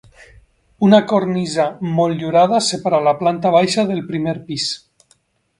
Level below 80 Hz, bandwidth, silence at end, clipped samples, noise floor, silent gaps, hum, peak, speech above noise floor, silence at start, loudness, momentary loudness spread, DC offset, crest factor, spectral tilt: -56 dBFS; 11.5 kHz; 0.8 s; under 0.1%; -59 dBFS; none; none; 0 dBFS; 44 dB; 0.8 s; -17 LUFS; 9 LU; under 0.1%; 16 dB; -5.5 dB/octave